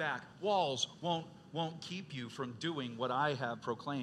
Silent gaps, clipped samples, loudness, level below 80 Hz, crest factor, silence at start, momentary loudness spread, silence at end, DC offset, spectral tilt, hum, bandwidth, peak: none; under 0.1%; -38 LUFS; -80 dBFS; 18 dB; 0 s; 10 LU; 0 s; under 0.1%; -4.5 dB/octave; none; 12 kHz; -20 dBFS